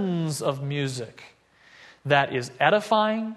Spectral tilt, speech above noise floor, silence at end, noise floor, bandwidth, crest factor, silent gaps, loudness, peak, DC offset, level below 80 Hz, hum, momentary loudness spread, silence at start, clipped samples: -5 dB/octave; 29 dB; 0 s; -54 dBFS; 12.5 kHz; 22 dB; none; -24 LUFS; -4 dBFS; under 0.1%; -68 dBFS; none; 13 LU; 0 s; under 0.1%